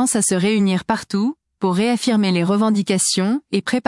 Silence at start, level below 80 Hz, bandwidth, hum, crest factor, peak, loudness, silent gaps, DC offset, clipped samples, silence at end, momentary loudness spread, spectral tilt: 0 s; -60 dBFS; 12 kHz; none; 12 dB; -6 dBFS; -18 LUFS; none; under 0.1%; under 0.1%; 0.05 s; 5 LU; -4.5 dB/octave